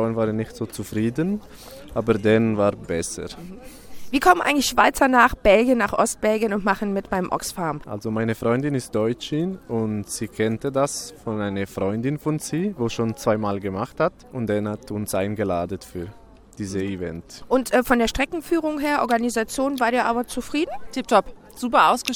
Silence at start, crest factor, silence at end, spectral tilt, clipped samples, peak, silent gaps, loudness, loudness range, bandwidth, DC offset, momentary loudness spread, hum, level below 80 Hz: 0 s; 20 dB; 0 s; -5 dB/octave; under 0.1%; -2 dBFS; none; -22 LUFS; 7 LU; 19.5 kHz; under 0.1%; 13 LU; none; -44 dBFS